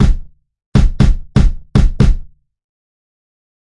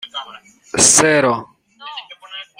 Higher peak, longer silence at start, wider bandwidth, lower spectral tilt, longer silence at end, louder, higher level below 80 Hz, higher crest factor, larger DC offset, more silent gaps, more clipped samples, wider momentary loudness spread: about the same, 0 dBFS vs 0 dBFS; about the same, 0 s vs 0.05 s; second, 10 kHz vs over 20 kHz; first, -7.5 dB/octave vs -1.5 dB/octave; first, 1.55 s vs 0.15 s; second, -15 LUFS vs -12 LUFS; first, -16 dBFS vs -52 dBFS; about the same, 14 dB vs 18 dB; neither; first, 0.66-0.72 s vs none; neither; second, 5 LU vs 23 LU